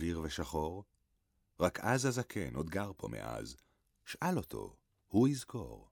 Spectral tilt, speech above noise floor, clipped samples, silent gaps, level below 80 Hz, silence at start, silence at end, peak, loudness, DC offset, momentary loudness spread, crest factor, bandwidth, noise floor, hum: -5.5 dB/octave; 42 dB; under 0.1%; none; -56 dBFS; 0 s; 0.1 s; -16 dBFS; -37 LUFS; under 0.1%; 17 LU; 22 dB; 19.5 kHz; -78 dBFS; none